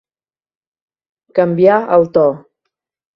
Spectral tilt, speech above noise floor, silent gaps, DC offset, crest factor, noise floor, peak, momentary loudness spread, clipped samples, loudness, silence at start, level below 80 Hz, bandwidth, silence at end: -9.5 dB/octave; over 78 dB; none; under 0.1%; 16 dB; under -90 dBFS; 0 dBFS; 8 LU; under 0.1%; -13 LUFS; 1.35 s; -58 dBFS; 5.8 kHz; 0.8 s